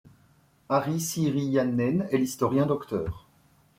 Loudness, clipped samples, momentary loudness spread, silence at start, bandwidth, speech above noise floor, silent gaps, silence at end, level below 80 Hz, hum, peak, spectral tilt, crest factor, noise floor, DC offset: -27 LUFS; under 0.1%; 7 LU; 0.05 s; 16.5 kHz; 36 dB; none; 0.6 s; -54 dBFS; none; -10 dBFS; -6 dB/octave; 16 dB; -62 dBFS; under 0.1%